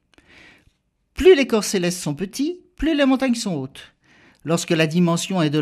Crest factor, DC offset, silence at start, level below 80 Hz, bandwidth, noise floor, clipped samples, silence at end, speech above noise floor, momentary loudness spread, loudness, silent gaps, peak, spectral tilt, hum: 18 dB; under 0.1%; 1.15 s; -44 dBFS; 15 kHz; -63 dBFS; under 0.1%; 0 s; 44 dB; 12 LU; -20 LUFS; none; -2 dBFS; -5 dB/octave; none